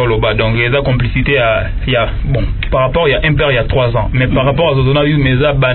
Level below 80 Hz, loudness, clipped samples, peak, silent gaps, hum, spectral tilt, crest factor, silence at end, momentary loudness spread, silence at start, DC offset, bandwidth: -22 dBFS; -12 LUFS; under 0.1%; -2 dBFS; none; none; -10.5 dB/octave; 10 dB; 0 s; 4 LU; 0 s; under 0.1%; 4.3 kHz